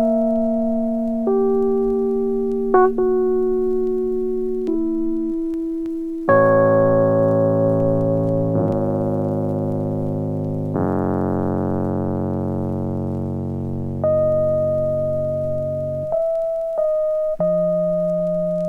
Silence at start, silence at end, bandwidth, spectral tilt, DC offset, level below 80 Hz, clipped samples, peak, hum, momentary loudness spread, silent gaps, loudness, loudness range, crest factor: 0 s; 0 s; 3.6 kHz; -11 dB/octave; under 0.1%; -44 dBFS; under 0.1%; -4 dBFS; none; 8 LU; none; -20 LUFS; 5 LU; 16 dB